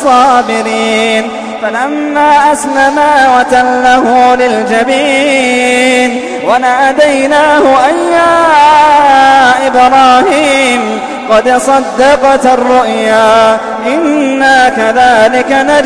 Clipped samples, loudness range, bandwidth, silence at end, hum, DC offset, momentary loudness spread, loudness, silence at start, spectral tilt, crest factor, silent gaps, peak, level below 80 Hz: 0.9%; 3 LU; 11 kHz; 0 s; none; under 0.1%; 7 LU; -7 LUFS; 0 s; -3 dB/octave; 6 dB; none; 0 dBFS; -40 dBFS